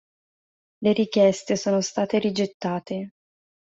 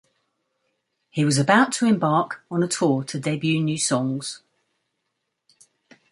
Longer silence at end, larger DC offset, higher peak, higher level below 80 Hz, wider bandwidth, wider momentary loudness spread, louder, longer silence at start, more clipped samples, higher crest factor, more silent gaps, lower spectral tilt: second, 0.65 s vs 1.75 s; neither; second, -6 dBFS vs -2 dBFS; about the same, -66 dBFS vs -66 dBFS; second, 8 kHz vs 11.5 kHz; about the same, 12 LU vs 11 LU; about the same, -24 LUFS vs -22 LUFS; second, 0.8 s vs 1.15 s; neither; about the same, 18 dB vs 22 dB; first, 2.54-2.60 s vs none; about the same, -5 dB/octave vs -4.5 dB/octave